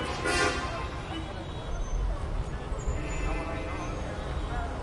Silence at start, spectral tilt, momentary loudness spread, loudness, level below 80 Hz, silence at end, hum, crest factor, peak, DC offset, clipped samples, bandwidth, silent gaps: 0 s; -4.5 dB/octave; 9 LU; -33 LUFS; -34 dBFS; 0 s; none; 18 dB; -14 dBFS; under 0.1%; under 0.1%; 11.5 kHz; none